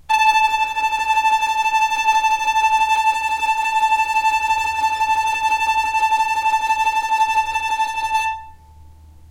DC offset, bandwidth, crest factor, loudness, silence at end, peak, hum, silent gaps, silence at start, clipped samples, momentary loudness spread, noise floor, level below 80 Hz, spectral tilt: under 0.1%; 16 kHz; 14 dB; -17 LUFS; 0.05 s; -4 dBFS; none; none; 0.1 s; under 0.1%; 4 LU; -43 dBFS; -48 dBFS; 0.5 dB/octave